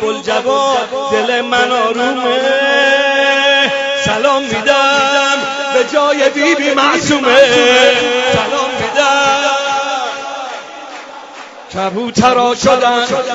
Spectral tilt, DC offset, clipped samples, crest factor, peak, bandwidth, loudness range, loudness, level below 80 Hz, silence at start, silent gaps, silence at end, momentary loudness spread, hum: -2.5 dB/octave; under 0.1%; under 0.1%; 12 dB; 0 dBFS; 8 kHz; 6 LU; -11 LUFS; -50 dBFS; 0 s; none; 0 s; 13 LU; none